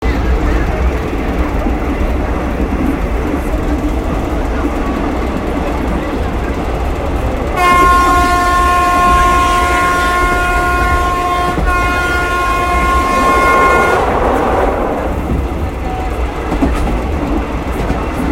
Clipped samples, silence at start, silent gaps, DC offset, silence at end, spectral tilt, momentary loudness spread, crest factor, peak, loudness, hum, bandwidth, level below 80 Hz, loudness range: under 0.1%; 0 s; none; under 0.1%; 0 s; -5.5 dB/octave; 8 LU; 12 dB; 0 dBFS; -14 LUFS; none; 16.5 kHz; -18 dBFS; 7 LU